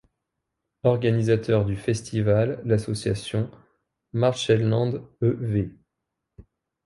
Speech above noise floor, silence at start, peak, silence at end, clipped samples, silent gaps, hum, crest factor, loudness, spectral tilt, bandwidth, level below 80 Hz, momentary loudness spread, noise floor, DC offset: 59 dB; 0.85 s; -6 dBFS; 0.45 s; under 0.1%; none; none; 18 dB; -24 LUFS; -7 dB/octave; 11.5 kHz; -50 dBFS; 7 LU; -82 dBFS; under 0.1%